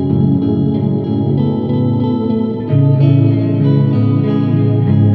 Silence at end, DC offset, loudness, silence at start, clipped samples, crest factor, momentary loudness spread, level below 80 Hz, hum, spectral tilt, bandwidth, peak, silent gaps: 0 s; under 0.1%; -13 LUFS; 0 s; under 0.1%; 10 dB; 5 LU; -50 dBFS; none; -12 dB/octave; 4.5 kHz; -2 dBFS; none